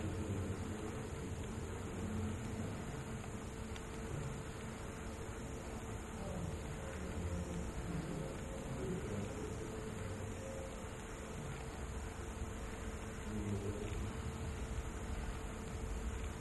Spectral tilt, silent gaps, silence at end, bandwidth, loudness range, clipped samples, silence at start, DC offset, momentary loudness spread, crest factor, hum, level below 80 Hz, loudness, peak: -5.5 dB/octave; none; 0 s; 12 kHz; 2 LU; under 0.1%; 0 s; under 0.1%; 5 LU; 14 dB; none; -50 dBFS; -45 LUFS; -28 dBFS